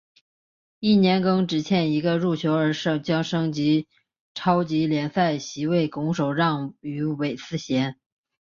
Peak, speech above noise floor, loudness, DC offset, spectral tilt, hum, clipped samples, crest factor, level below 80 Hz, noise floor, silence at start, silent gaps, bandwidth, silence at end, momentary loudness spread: -6 dBFS; over 67 dB; -23 LUFS; under 0.1%; -6.5 dB/octave; none; under 0.1%; 18 dB; -62 dBFS; under -90 dBFS; 0.8 s; 4.20-4.35 s; 7.4 kHz; 0.55 s; 8 LU